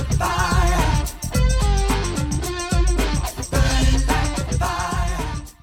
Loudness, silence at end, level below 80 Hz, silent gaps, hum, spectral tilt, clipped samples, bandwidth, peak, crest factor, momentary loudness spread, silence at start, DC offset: -21 LUFS; 0.1 s; -22 dBFS; none; none; -4.5 dB/octave; under 0.1%; 16.5 kHz; -4 dBFS; 16 dB; 6 LU; 0 s; under 0.1%